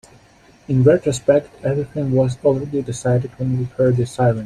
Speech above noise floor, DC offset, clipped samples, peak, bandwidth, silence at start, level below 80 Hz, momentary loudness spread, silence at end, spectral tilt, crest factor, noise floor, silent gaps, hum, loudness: 32 dB; under 0.1%; under 0.1%; -2 dBFS; 10.5 kHz; 0.7 s; -48 dBFS; 8 LU; 0 s; -7.5 dB/octave; 16 dB; -50 dBFS; none; none; -19 LUFS